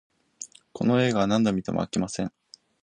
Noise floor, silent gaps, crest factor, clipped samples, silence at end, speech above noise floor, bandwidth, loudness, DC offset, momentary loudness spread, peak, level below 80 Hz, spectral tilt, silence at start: -46 dBFS; none; 18 dB; under 0.1%; 0.55 s; 22 dB; 11 kHz; -25 LUFS; under 0.1%; 19 LU; -10 dBFS; -56 dBFS; -5.5 dB/octave; 0.4 s